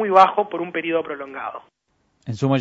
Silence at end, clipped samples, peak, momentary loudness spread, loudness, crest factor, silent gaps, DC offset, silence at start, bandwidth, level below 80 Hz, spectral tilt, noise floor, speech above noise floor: 0 s; under 0.1%; 0 dBFS; 19 LU; -21 LUFS; 20 dB; none; under 0.1%; 0 s; 8 kHz; -64 dBFS; -7 dB/octave; -66 dBFS; 47 dB